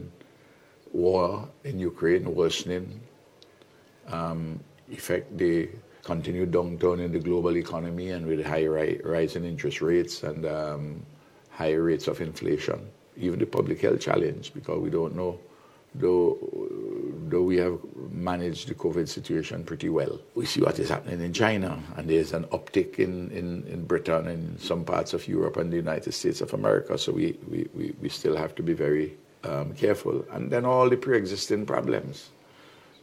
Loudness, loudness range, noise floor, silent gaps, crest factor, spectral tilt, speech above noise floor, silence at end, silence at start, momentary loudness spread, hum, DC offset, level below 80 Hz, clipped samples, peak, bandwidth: -28 LUFS; 4 LU; -56 dBFS; none; 22 dB; -6 dB/octave; 29 dB; 0.75 s; 0 s; 10 LU; none; under 0.1%; -56 dBFS; under 0.1%; -6 dBFS; 15 kHz